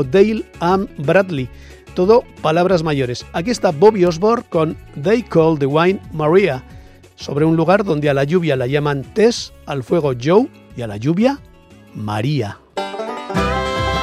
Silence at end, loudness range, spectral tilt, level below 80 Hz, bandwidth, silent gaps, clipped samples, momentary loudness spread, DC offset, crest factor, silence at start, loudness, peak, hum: 0 s; 4 LU; -6.5 dB/octave; -40 dBFS; 14 kHz; none; under 0.1%; 12 LU; under 0.1%; 16 dB; 0 s; -17 LUFS; 0 dBFS; none